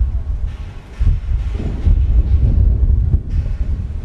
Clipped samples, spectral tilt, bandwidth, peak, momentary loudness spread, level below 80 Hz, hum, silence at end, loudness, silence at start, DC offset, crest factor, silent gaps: under 0.1%; -9.5 dB/octave; 4.1 kHz; -4 dBFS; 10 LU; -16 dBFS; none; 0 s; -18 LUFS; 0 s; under 0.1%; 10 dB; none